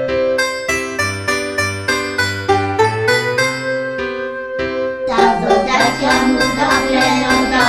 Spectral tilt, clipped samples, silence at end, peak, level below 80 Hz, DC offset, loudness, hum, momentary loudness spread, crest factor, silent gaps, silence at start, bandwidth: -4 dB/octave; under 0.1%; 0 s; 0 dBFS; -40 dBFS; under 0.1%; -15 LUFS; none; 7 LU; 16 dB; none; 0 s; 16 kHz